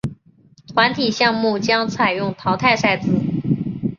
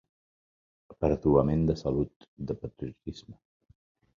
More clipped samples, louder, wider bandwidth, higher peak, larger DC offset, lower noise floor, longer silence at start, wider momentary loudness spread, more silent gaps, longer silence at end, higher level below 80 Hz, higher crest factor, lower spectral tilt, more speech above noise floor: neither; first, -18 LUFS vs -29 LUFS; about the same, 7.4 kHz vs 7.2 kHz; first, -2 dBFS vs -10 dBFS; neither; second, -52 dBFS vs under -90 dBFS; second, 0.05 s vs 0.9 s; second, 6 LU vs 18 LU; second, none vs 2.16-2.20 s, 2.28-2.37 s; second, 0.05 s vs 0.85 s; about the same, -50 dBFS vs -46 dBFS; about the same, 18 dB vs 22 dB; second, -5.5 dB/octave vs -9.5 dB/octave; second, 34 dB vs over 61 dB